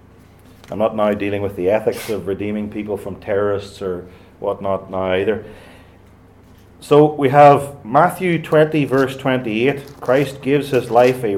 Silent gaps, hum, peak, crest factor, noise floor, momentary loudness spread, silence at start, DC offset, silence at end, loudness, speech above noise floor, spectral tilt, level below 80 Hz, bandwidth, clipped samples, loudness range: none; none; 0 dBFS; 18 dB; -46 dBFS; 12 LU; 0.7 s; under 0.1%; 0 s; -17 LUFS; 29 dB; -6.5 dB/octave; -52 dBFS; 16.5 kHz; under 0.1%; 8 LU